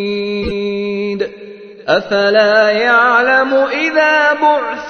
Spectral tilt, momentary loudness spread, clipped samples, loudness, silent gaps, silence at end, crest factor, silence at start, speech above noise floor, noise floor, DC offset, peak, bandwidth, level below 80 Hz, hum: -4.5 dB/octave; 10 LU; under 0.1%; -12 LUFS; none; 0 s; 14 dB; 0 s; 21 dB; -33 dBFS; under 0.1%; 0 dBFS; 6.6 kHz; -42 dBFS; none